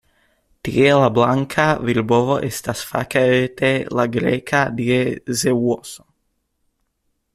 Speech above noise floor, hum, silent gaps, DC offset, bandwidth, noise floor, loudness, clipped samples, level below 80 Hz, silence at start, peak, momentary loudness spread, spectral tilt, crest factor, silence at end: 53 dB; none; none; under 0.1%; 15.5 kHz; -70 dBFS; -18 LUFS; under 0.1%; -52 dBFS; 0.65 s; -2 dBFS; 9 LU; -5.5 dB/octave; 16 dB; 1.4 s